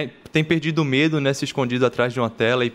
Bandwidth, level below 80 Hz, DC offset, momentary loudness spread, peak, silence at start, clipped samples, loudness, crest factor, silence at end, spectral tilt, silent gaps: 13 kHz; -58 dBFS; under 0.1%; 4 LU; -6 dBFS; 0 s; under 0.1%; -21 LUFS; 16 dB; 0 s; -6 dB/octave; none